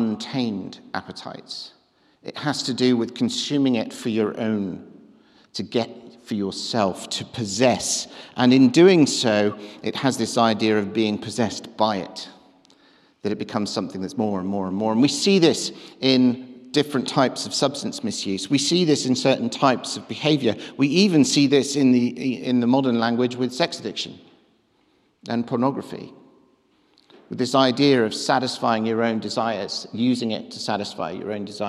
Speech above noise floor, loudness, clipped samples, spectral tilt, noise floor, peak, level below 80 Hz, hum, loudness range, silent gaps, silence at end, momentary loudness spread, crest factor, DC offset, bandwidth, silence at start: 42 dB; -22 LUFS; under 0.1%; -4.5 dB/octave; -63 dBFS; -4 dBFS; -68 dBFS; none; 8 LU; none; 0 s; 15 LU; 18 dB; under 0.1%; 13 kHz; 0 s